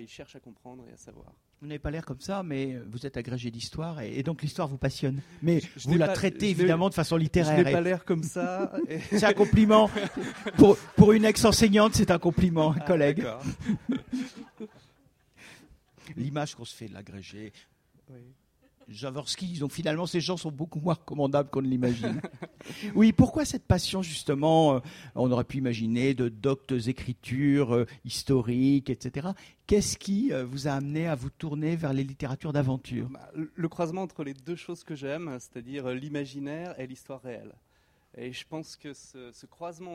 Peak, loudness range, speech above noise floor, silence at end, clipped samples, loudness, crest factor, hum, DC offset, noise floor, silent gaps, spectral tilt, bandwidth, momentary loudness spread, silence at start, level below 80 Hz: -2 dBFS; 17 LU; 37 dB; 0 s; under 0.1%; -27 LUFS; 24 dB; none; under 0.1%; -64 dBFS; none; -6 dB/octave; 16 kHz; 20 LU; 0 s; -50 dBFS